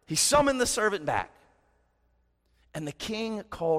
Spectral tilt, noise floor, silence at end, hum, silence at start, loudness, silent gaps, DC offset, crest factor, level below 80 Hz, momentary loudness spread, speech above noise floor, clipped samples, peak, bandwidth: -2.5 dB/octave; -70 dBFS; 0 s; 60 Hz at -70 dBFS; 0.1 s; -27 LUFS; none; under 0.1%; 18 dB; -52 dBFS; 16 LU; 43 dB; under 0.1%; -10 dBFS; 16 kHz